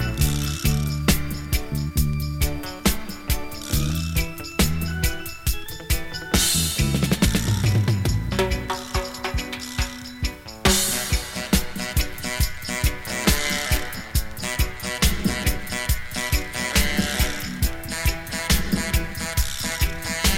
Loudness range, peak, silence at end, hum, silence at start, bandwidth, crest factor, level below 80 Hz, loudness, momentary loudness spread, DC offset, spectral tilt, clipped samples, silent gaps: 3 LU; -2 dBFS; 0 s; none; 0 s; 17 kHz; 20 dB; -28 dBFS; -24 LUFS; 7 LU; under 0.1%; -3.5 dB/octave; under 0.1%; none